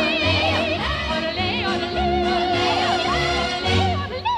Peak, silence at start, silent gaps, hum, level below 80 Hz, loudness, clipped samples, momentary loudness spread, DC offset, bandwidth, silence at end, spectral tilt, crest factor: -8 dBFS; 0 s; none; none; -36 dBFS; -20 LUFS; under 0.1%; 4 LU; under 0.1%; 12.5 kHz; 0 s; -5 dB/octave; 14 dB